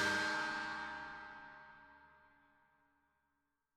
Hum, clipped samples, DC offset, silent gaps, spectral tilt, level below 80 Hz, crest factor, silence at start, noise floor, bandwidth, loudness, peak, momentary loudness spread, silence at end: none; under 0.1%; under 0.1%; none; -2 dB/octave; -74 dBFS; 20 dB; 0 s; -85 dBFS; 15 kHz; -40 LUFS; -24 dBFS; 23 LU; 1.6 s